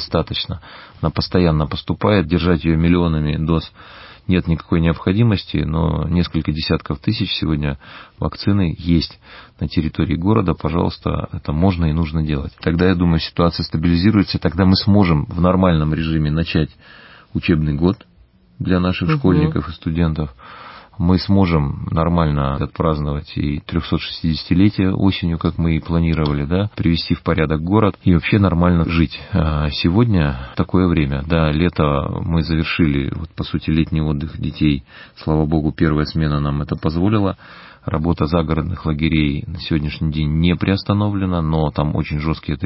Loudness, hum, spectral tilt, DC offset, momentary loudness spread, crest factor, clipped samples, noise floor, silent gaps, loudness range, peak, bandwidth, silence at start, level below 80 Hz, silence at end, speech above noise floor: -18 LUFS; none; -11.5 dB/octave; under 0.1%; 8 LU; 16 dB; under 0.1%; -51 dBFS; none; 3 LU; -2 dBFS; 5.8 kHz; 0 s; -28 dBFS; 0 s; 33 dB